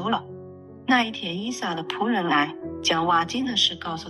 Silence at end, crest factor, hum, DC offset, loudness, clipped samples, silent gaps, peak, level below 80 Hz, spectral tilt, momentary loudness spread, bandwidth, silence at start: 0 s; 18 dB; none; under 0.1%; -24 LUFS; under 0.1%; none; -8 dBFS; -58 dBFS; -3.5 dB/octave; 11 LU; 12 kHz; 0 s